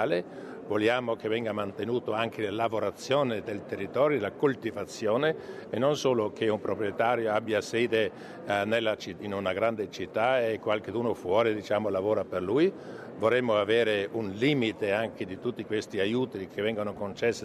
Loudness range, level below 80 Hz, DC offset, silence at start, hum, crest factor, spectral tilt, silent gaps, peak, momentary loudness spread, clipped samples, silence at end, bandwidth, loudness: 2 LU; -68 dBFS; under 0.1%; 0 s; none; 18 dB; -5.5 dB/octave; none; -12 dBFS; 8 LU; under 0.1%; 0 s; 13.5 kHz; -29 LUFS